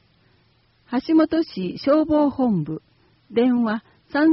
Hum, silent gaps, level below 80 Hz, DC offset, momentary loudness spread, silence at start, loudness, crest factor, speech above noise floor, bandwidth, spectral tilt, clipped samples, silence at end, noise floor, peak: none; none; -56 dBFS; under 0.1%; 10 LU; 0.9 s; -21 LUFS; 14 dB; 41 dB; 5.8 kHz; -6 dB/octave; under 0.1%; 0 s; -61 dBFS; -8 dBFS